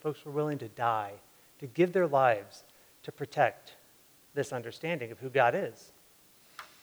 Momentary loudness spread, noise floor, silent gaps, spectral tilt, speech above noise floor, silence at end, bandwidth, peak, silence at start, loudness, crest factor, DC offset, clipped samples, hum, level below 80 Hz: 23 LU; -61 dBFS; none; -6 dB/octave; 30 dB; 0.15 s; over 20 kHz; -10 dBFS; 0.05 s; -31 LUFS; 22 dB; under 0.1%; under 0.1%; none; -80 dBFS